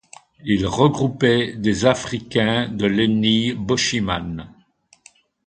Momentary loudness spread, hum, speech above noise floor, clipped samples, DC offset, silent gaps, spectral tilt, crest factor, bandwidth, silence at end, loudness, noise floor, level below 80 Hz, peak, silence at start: 7 LU; none; 37 dB; under 0.1%; under 0.1%; none; -5 dB/octave; 20 dB; 9.4 kHz; 1 s; -19 LUFS; -57 dBFS; -46 dBFS; 0 dBFS; 0.45 s